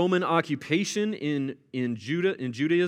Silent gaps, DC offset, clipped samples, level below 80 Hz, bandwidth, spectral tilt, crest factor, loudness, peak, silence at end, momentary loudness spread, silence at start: none; under 0.1%; under 0.1%; -80 dBFS; 13 kHz; -5.5 dB/octave; 18 dB; -28 LUFS; -8 dBFS; 0 s; 7 LU; 0 s